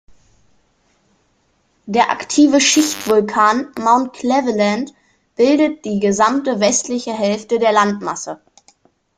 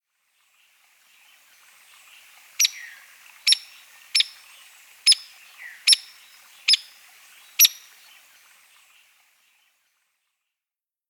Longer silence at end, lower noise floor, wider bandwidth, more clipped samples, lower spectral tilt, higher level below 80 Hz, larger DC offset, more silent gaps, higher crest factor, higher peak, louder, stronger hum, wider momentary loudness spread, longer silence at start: second, 0.8 s vs 3.35 s; second, -61 dBFS vs under -90 dBFS; second, 15.5 kHz vs over 20 kHz; neither; first, -3.5 dB/octave vs 8 dB/octave; first, -58 dBFS vs under -90 dBFS; neither; neither; second, 16 dB vs 26 dB; about the same, 0 dBFS vs -2 dBFS; first, -16 LUFS vs -19 LUFS; neither; second, 11 LU vs 25 LU; second, 1.85 s vs 2.6 s